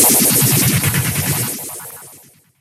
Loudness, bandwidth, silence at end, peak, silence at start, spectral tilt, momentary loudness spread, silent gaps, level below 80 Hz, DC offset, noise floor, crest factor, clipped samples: -14 LUFS; 16.5 kHz; 0.45 s; 0 dBFS; 0 s; -3 dB/octave; 20 LU; none; -46 dBFS; under 0.1%; -45 dBFS; 16 dB; under 0.1%